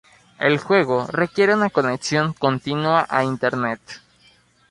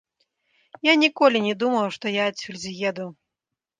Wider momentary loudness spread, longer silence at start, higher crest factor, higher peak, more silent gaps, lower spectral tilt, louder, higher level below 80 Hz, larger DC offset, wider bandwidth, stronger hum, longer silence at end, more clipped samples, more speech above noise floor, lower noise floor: second, 8 LU vs 15 LU; second, 0.4 s vs 0.85 s; about the same, 18 dB vs 20 dB; about the same, -2 dBFS vs -4 dBFS; neither; first, -5.5 dB/octave vs -4 dB/octave; about the same, -20 LUFS vs -22 LUFS; first, -60 dBFS vs -72 dBFS; neither; first, 11.5 kHz vs 9.6 kHz; neither; about the same, 0.75 s vs 0.7 s; neither; second, 36 dB vs 64 dB; second, -56 dBFS vs -86 dBFS